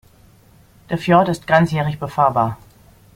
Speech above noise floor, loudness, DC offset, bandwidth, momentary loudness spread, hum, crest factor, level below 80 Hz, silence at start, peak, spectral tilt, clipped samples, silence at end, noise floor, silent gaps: 33 dB; -17 LUFS; under 0.1%; 16 kHz; 9 LU; none; 18 dB; -50 dBFS; 0.9 s; -2 dBFS; -7 dB/octave; under 0.1%; 0.6 s; -50 dBFS; none